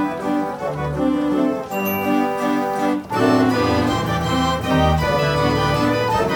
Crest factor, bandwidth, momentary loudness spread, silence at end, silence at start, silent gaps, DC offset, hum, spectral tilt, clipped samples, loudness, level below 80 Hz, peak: 14 dB; 19 kHz; 5 LU; 0 s; 0 s; none; under 0.1%; none; -6 dB/octave; under 0.1%; -19 LUFS; -36 dBFS; -4 dBFS